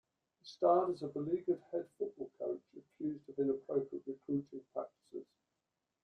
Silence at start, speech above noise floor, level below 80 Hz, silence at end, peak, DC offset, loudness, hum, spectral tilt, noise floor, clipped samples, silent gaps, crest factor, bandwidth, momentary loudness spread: 0.45 s; 50 dB; -82 dBFS; 0.8 s; -18 dBFS; under 0.1%; -38 LUFS; none; -8.5 dB/octave; -88 dBFS; under 0.1%; none; 20 dB; 8 kHz; 16 LU